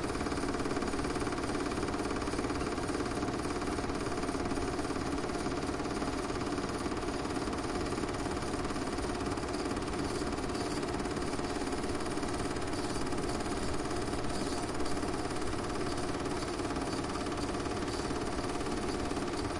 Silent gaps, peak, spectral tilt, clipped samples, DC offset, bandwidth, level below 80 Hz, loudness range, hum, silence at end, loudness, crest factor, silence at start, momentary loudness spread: none; -20 dBFS; -5 dB/octave; under 0.1%; under 0.1%; 11.5 kHz; -46 dBFS; 1 LU; none; 0 s; -35 LUFS; 14 dB; 0 s; 1 LU